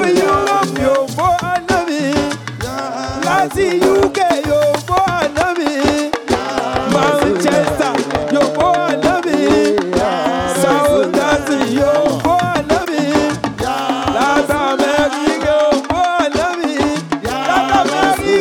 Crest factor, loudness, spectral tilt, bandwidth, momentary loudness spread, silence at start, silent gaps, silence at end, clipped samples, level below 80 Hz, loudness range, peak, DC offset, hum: 12 dB; -15 LUFS; -4.5 dB/octave; 18.5 kHz; 5 LU; 0 s; none; 0 s; under 0.1%; -40 dBFS; 2 LU; -2 dBFS; under 0.1%; none